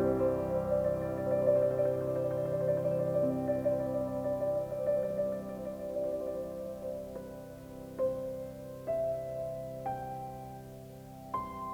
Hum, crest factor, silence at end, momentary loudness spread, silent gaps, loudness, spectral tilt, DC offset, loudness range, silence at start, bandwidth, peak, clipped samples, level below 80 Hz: none; 18 dB; 0 s; 15 LU; none; -34 LUFS; -8.5 dB/octave; under 0.1%; 8 LU; 0 s; 19.5 kHz; -16 dBFS; under 0.1%; -58 dBFS